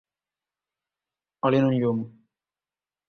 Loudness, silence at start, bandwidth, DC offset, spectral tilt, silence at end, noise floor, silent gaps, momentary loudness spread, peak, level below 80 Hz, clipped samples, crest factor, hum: -24 LUFS; 1.45 s; 6.4 kHz; under 0.1%; -9 dB/octave; 1 s; under -90 dBFS; none; 11 LU; -8 dBFS; -66 dBFS; under 0.1%; 20 dB; 50 Hz at -70 dBFS